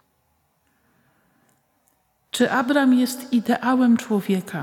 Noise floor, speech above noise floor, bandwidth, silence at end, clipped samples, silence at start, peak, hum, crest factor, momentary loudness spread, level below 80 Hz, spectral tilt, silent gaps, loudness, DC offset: -67 dBFS; 48 dB; 16.5 kHz; 0 s; under 0.1%; 2.35 s; -6 dBFS; none; 16 dB; 6 LU; -74 dBFS; -5 dB/octave; none; -20 LUFS; under 0.1%